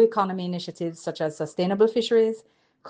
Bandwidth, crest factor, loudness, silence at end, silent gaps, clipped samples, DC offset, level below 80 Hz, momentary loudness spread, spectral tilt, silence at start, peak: 9.4 kHz; 16 dB; -25 LUFS; 0 s; none; under 0.1%; under 0.1%; -74 dBFS; 10 LU; -6 dB/octave; 0 s; -8 dBFS